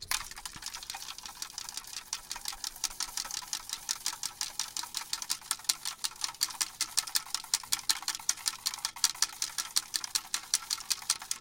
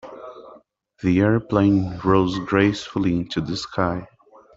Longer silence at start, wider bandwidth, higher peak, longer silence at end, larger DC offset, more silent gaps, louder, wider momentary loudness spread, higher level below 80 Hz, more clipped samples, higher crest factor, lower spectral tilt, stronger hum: about the same, 0 s vs 0.05 s; first, 17 kHz vs 7.8 kHz; about the same, -4 dBFS vs -4 dBFS; second, 0 s vs 0.5 s; neither; neither; second, -33 LUFS vs -21 LUFS; about the same, 10 LU vs 11 LU; second, -62 dBFS vs -48 dBFS; neither; first, 32 dB vs 18 dB; second, 2.5 dB/octave vs -7 dB/octave; neither